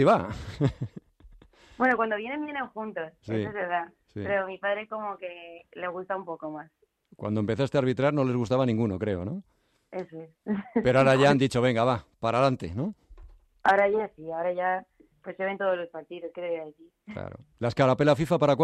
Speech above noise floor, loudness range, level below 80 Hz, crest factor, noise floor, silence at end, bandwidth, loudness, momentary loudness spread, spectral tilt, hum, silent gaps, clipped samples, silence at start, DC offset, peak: 28 dB; 8 LU; -58 dBFS; 18 dB; -54 dBFS; 0 s; 12.5 kHz; -27 LUFS; 17 LU; -7 dB/octave; none; none; under 0.1%; 0 s; under 0.1%; -10 dBFS